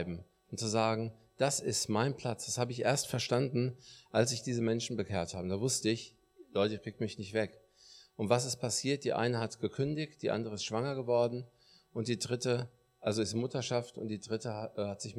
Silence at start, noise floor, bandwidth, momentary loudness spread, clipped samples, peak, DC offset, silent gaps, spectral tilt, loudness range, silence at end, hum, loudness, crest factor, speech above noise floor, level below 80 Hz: 0 s; -60 dBFS; 15.5 kHz; 9 LU; under 0.1%; -12 dBFS; under 0.1%; none; -4.5 dB/octave; 3 LU; 0 s; none; -34 LUFS; 22 dB; 26 dB; -70 dBFS